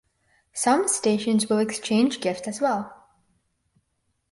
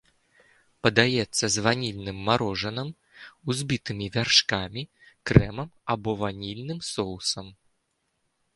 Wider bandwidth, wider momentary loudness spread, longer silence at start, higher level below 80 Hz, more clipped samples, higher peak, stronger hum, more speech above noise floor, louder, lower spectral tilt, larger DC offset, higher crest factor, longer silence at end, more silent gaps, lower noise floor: about the same, 11.5 kHz vs 11.5 kHz; second, 8 LU vs 15 LU; second, 0.55 s vs 0.85 s; second, -68 dBFS vs -46 dBFS; neither; second, -8 dBFS vs 0 dBFS; neither; about the same, 51 dB vs 49 dB; about the same, -23 LUFS vs -25 LUFS; about the same, -3.5 dB/octave vs -4 dB/octave; neither; second, 18 dB vs 26 dB; first, 1.4 s vs 1.05 s; neither; about the same, -74 dBFS vs -75 dBFS